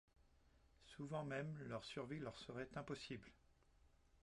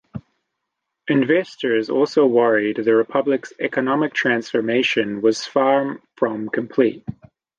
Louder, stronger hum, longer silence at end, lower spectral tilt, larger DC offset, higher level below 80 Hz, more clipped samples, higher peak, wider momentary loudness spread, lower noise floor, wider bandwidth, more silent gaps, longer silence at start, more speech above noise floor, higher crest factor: second, -51 LUFS vs -19 LUFS; neither; second, 0 s vs 0.45 s; about the same, -6 dB/octave vs -5.5 dB/octave; neither; second, -74 dBFS vs -62 dBFS; neither; second, -34 dBFS vs -4 dBFS; about the same, 9 LU vs 8 LU; second, -74 dBFS vs -79 dBFS; first, 11 kHz vs 9 kHz; neither; about the same, 0.2 s vs 0.15 s; second, 24 dB vs 60 dB; about the same, 18 dB vs 16 dB